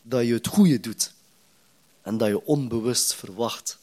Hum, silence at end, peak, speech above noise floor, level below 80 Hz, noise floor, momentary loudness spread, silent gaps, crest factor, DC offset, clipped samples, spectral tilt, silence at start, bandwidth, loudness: none; 0.1 s; -8 dBFS; 38 dB; -64 dBFS; -61 dBFS; 9 LU; none; 18 dB; under 0.1%; under 0.1%; -4.5 dB/octave; 0.05 s; 16 kHz; -24 LUFS